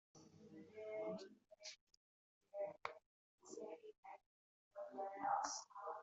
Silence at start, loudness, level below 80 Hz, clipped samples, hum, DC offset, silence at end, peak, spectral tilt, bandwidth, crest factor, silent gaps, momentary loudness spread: 0.15 s; -50 LUFS; under -90 dBFS; under 0.1%; none; under 0.1%; 0 s; -28 dBFS; -2 dB/octave; 8 kHz; 24 dB; 1.81-1.87 s, 1.97-2.41 s, 3.06-3.38 s, 3.98-4.03 s, 4.26-4.71 s; 21 LU